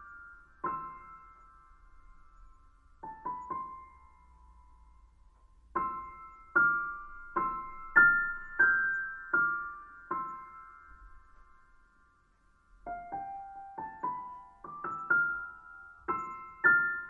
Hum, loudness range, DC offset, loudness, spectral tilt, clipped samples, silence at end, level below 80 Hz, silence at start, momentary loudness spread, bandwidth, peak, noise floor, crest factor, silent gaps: none; 18 LU; under 0.1%; -31 LUFS; -7 dB/octave; under 0.1%; 0 s; -60 dBFS; 0 s; 25 LU; 7.2 kHz; -10 dBFS; -67 dBFS; 24 dB; none